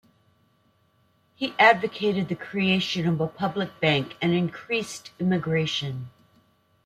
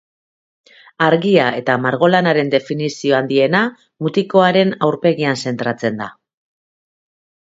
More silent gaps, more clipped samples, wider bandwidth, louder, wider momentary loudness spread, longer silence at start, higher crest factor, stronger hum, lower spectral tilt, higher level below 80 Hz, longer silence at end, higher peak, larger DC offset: neither; neither; first, 13.5 kHz vs 8 kHz; second, -24 LUFS vs -16 LUFS; first, 13 LU vs 9 LU; first, 1.4 s vs 1 s; about the same, 22 dB vs 18 dB; neither; about the same, -5.5 dB/octave vs -6 dB/octave; about the same, -64 dBFS vs -64 dBFS; second, 0.75 s vs 1.45 s; second, -4 dBFS vs 0 dBFS; neither